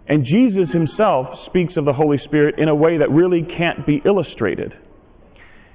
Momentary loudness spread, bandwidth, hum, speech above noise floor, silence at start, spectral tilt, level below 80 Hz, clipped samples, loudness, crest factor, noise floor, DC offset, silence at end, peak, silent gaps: 7 LU; 4 kHz; none; 30 dB; 0.1 s; -11.5 dB/octave; -48 dBFS; under 0.1%; -17 LUFS; 12 dB; -46 dBFS; under 0.1%; 1 s; -6 dBFS; none